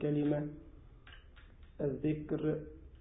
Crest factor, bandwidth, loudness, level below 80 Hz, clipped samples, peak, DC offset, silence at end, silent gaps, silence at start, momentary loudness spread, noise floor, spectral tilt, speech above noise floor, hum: 18 dB; 3.8 kHz; -37 LUFS; -56 dBFS; under 0.1%; -20 dBFS; under 0.1%; 0 s; none; 0 s; 24 LU; -56 dBFS; -8 dB/octave; 21 dB; none